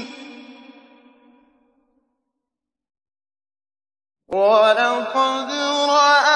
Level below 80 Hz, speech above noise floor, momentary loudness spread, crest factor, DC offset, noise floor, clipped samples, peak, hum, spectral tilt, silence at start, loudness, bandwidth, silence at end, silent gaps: -72 dBFS; 68 dB; 20 LU; 18 dB; under 0.1%; -85 dBFS; under 0.1%; -4 dBFS; none; -1.5 dB/octave; 0 s; -17 LUFS; 10 kHz; 0 s; none